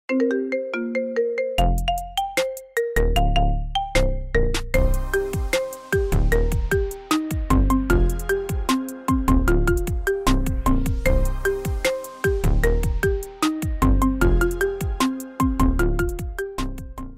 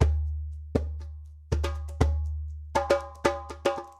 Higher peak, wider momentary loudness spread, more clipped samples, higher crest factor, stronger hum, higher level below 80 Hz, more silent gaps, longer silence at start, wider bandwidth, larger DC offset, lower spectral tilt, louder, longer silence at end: about the same, -6 dBFS vs -6 dBFS; second, 5 LU vs 11 LU; neither; second, 16 dB vs 22 dB; neither; first, -24 dBFS vs -32 dBFS; neither; about the same, 0.1 s vs 0 s; first, 16 kHz vs 11 kHz; neither; about the same, -5.5 dB/octave vs -6.5 dB/octave; first, -23 LUFS vs -30 LUFS; about the same, 0 s vs 0.05 s